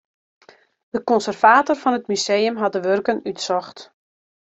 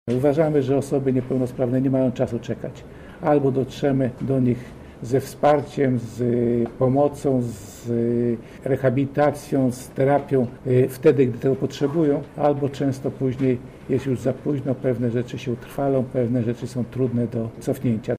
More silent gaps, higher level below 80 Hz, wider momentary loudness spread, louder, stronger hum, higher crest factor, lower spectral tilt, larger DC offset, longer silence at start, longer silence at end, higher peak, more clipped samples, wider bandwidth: neither; second, -68 dBFS vs -50 dBFS; first, 11 LU vs 8 LU; first, -19 LUFS vs -22 LUFS; neither; about the same, 20 dB vs 16 dB; second, -3.5 dB/octave vs -8 dB/octave; neither; first, 0.95 s vs 0.05 s; first, 0.75 s vs 0 s; first, -2 dBFS vs -6 dBFS; neither; second, 8.2 kHz vs 15.5 kHz